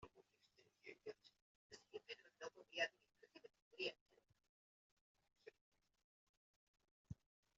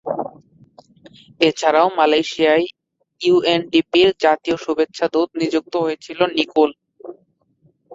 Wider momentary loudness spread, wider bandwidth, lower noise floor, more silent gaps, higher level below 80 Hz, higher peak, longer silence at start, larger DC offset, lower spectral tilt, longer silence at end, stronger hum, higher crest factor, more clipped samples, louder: first, 22 LU vs 12 LU; about the same, 7.4 kHz vs 7.8 kHz; first, -78 dBFS vs -60 dBFS; first, 1.42-1.70 s, 3.62-3.71 s, 4.01-4.06 s, 4.49-5.15 s, 5.61-5.72 s, 6.04-6.74 s, 6.91-7.05 s vs none; second, -84 dBFS vs -62 dBFS; second, -30 dBFS vs -2 dBFS; about the same, 0 s vs 0.05 s; neither; second, -1 dB/octave vs -4.5 dB/octave; first, 0.45 s vs 0 s; neither; first, 28 dB vs 18 dB; neither; second, -52 LUFS vs -18 LUFS